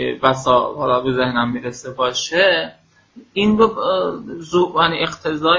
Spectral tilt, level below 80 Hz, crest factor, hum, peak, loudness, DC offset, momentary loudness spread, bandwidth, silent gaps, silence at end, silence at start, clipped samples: -4.5 dB/octave; -50 dBFS; 18 dB; none; 0 dBFS; -18 LUFS; under 0.1%; 10 LU; 7.8 kHz; none; 0 s; 0 s; under 0.1%